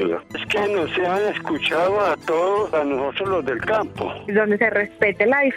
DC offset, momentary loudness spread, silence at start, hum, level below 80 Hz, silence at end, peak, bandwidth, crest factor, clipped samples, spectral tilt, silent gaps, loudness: under 0.1%; 5 LU; 0 s; none; -54 dBFS; 0 s; -4 dBFS; 13 kHz; 16 dB; under 0.1%; -5.5 dB/octave; none; -21 LUFS